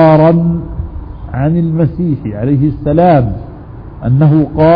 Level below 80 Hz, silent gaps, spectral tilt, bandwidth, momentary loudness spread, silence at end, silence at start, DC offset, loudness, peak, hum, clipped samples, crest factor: -28 dBFS; none; -12 dB/octave; 5 kHz; 17 LU; 0 s; 0 s; under 0.1%; -11 LUFS; 0 dBFS; none; under 0.1%; 10 dB